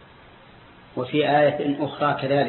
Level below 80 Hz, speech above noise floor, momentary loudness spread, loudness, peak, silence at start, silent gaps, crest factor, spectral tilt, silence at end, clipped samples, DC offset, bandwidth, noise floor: -60 dBFS; 27 dB; 11 LU; -22 LUFS; -8 dBFS; 0.95 s; none; 16 dB; -10.5 dB/octave; 0 s; under 0.1%; under 0.1%; 4.3 kHz; -49 dBFS